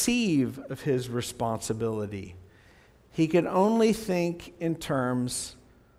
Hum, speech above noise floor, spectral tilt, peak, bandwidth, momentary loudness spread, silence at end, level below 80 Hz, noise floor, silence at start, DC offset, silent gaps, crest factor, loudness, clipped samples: none; 30 dB; -5 dB/octave; -12 dBFS; 16 kHz; 11 LU; 0.45 s; -56 dBFS; -57 dBFS; 0 s; under 0.1%; none; 16 dB; -28 LUFS; under 0.1%